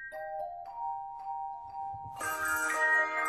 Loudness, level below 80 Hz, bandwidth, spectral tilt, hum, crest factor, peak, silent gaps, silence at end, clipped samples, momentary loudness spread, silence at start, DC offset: -33 LUFS; -66 dBFS; 16 kHz; -1.5 dB/octave; none; 16 dB; -18 dBFS; none; 0 s; under 0.1%; 15 LU; 0 s; under 0.1%